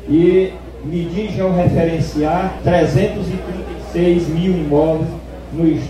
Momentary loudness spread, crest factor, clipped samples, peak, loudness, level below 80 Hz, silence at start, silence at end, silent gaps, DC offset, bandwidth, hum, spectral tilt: 11 LU; 16 dB; under 0.1%; 0 dBFS; -17 LUFS; -32 dBFS; 0 s; 0 s; none; under 0.1%; 12.5 kHz; none; -8 dB/octave